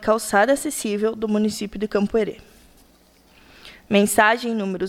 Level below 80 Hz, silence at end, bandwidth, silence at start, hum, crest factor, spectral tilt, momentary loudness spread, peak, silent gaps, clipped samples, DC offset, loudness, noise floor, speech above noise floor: -52 dBFS; 0 s; 16 kHz; 0 s; none; 18 dB; -4 dB/octave; 8 LU; -4 dBFS; none; under 0.1%; under 0.1%; -21 LUFS; -55 dBFS; 34 dB